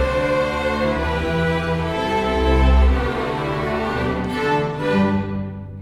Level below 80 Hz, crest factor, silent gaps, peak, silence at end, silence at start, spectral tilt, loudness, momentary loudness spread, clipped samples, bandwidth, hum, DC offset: -24 dBFS; 14 dB; none; -4 dBFS; 0 s; 0 s; -7 dB/octave; -20 LUFS; 6 LU; under 0.1%; 11.5 kHz; none; under 0.1%